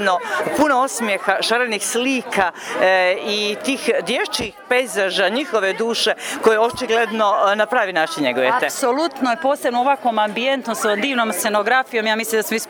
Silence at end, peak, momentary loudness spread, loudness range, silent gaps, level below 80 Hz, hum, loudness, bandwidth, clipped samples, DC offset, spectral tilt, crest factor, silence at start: 0 s; 0 dBFS; 4 LU; 1 LU; none; -58 dBFS; none; -18 LUFS; over 20 kHz; under 0.1%; under 0.1%; -2.5 dB/octave; 18 dB; 0 s